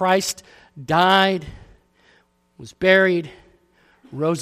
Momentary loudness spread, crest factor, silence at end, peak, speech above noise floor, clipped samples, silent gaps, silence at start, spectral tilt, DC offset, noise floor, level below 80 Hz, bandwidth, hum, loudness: 23 LU; 20 dB; 0 s; -2 dBFS; 40 dB; under 0.1%; none; 0 s; -4 dB/octave; under 0.1%; -59 dBFS; -52 dBFS; 15 kHz; none; -18 LUFS